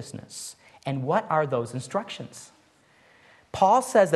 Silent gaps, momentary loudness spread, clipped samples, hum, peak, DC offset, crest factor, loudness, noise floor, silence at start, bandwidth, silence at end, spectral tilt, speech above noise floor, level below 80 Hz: none; 19 LU; under 0.1%; none; -6 dBFS; under 0.1%; 20 dB; -25 LUFS; -60 dBFS; 0 s; 12.5 kHz; 0 s; -5 dB/octave; 35 dB; -66 dBFS